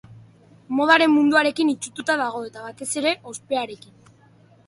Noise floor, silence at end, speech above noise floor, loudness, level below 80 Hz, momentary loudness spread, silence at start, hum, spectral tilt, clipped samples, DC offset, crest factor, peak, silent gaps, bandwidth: -54 dBFS; 0.9 s; 32 dB; -20 LUFS; -68 dBFS; 16 LU; 0.1 s; none; -3 dB/octave; under 0.1%; under 0.1%; 20 dB; -2 dBFS; none; 11.5 kHz